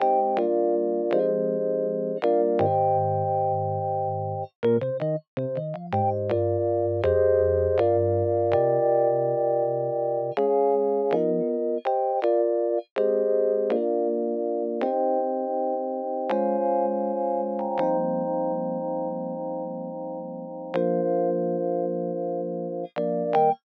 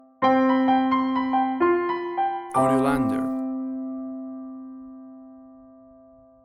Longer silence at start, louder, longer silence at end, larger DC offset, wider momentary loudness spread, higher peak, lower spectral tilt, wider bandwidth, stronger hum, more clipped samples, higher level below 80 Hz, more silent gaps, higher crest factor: second, 0 s vs 0.2 s; about the same, -25 LUFS vs -23 LUFS; second, 0.1 s vs 0.85 s; neither; second, 8 LU vs 20 LU; about the same, -10 dBFS vs -8 dBFS; first, -10.5 dB/octave vs -6.5 dB/octave; second, 5.2 kHz vs 12 kHz; neither; neither; about the same, -58 dBFS vs -56 dBFS; first, 4.55-4.63 s, 5.28-5.37 s, 12.91-12.96 s vs none; about the same, 14 dB vs 16 dB